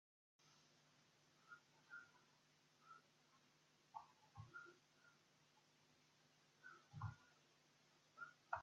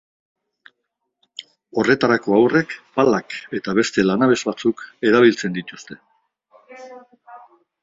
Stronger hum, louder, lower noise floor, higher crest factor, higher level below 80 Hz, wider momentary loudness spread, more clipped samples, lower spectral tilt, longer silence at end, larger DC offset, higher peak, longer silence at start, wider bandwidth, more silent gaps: neither; second, -61 LUFS vs -18 LUFS; about the same, -77 dBFS vs -77 dBFS; first, 32 dB vs 20 dB; second, -88 dBFS vs -60 dBFS; second, 12 LU vs 22 LU; neither; second, -4 dB/octave vs -5.5 dB/octave; second, 0 s vs 0.45 s; neither; second, -30 dBFS vs 0 dBFS; second, 0.4 s vs 1.4 s; about the same, 7.6 kHz vs 7.8 kHz; neither